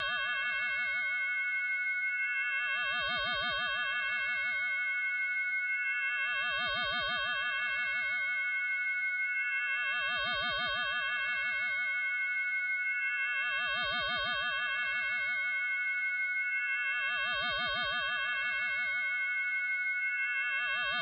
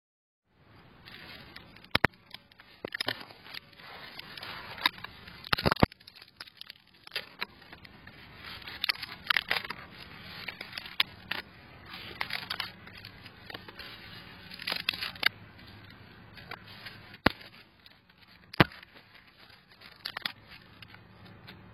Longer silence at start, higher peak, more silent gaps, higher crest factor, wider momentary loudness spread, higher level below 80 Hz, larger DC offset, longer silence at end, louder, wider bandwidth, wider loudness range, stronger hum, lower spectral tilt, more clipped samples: second, 0 s vs 0.7 s; second, -24 dBFS vs 0 dBFS; neither; second, 8 dB vs 36 dB; second, 1 LU vs 23 LU; second, -66 dBFS vs -56 dBFS; neither; about the same, 0 s vs 0 s; about the same, -31 LUFS vs -33 LUFS; second, 5.6 kHz vs 16.5 kHz; second, 0 LU vs 4 LU; neither; second, 3 dB/octave vs -4.5 dB/octave; neither